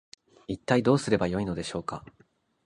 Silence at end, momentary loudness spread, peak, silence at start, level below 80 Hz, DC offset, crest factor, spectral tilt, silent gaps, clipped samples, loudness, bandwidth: 0.65 s; 16 LU; -8 dBFS; 0.5 s; -54 dBFS; under 0.1%; 22 dB; -6 dB/octave; none; under 0.1%; -28 LUFS; 11 kHz